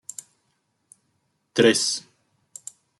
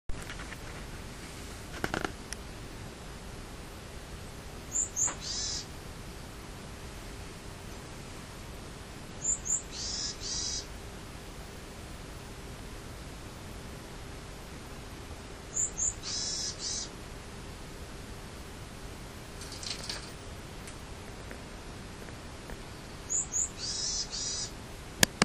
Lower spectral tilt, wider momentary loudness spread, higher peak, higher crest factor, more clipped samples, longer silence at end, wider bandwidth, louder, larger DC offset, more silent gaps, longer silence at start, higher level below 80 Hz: about the same, -3 dB/octave vs -2 dB/octave; first, 23 LU vs 14 LU; second, -4 dBFS vs 0 dBFS; second, 24 dB vs 38 dB; neither; first, 1 s vs 0 s; second, 12.5 kHz vs 15.5 kHz; first, -21 LUFS vs -37 LUFS; neither; neither; first, 1.55 s vs 0.1 s; second, -74 dBFS vs -48 dBFS